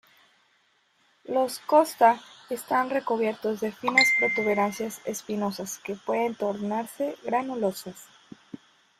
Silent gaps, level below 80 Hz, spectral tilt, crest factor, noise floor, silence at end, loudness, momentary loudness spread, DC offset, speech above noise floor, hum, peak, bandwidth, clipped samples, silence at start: none; -72 dBFS; -3.5 dB/octave; 22 dB; -67 dBFS; 0.45 s; -26 LUFS; 14 LU; under 0.1%; 41 dB; none; -4 dBFS; 16 kHz; under 0.1%; 1.3 s